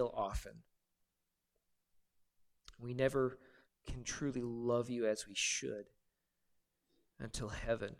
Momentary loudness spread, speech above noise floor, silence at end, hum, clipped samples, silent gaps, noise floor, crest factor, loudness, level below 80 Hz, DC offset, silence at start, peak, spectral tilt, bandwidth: 16 LU; 48 dB; 0.05 s; none; under 0.1%; none; -87 dBFS; 22 dB; -39 LUFS; -56 dBFS; under 0.1%; 0 s; -20 dBFS; -4 dB/octave; 15.5 kHz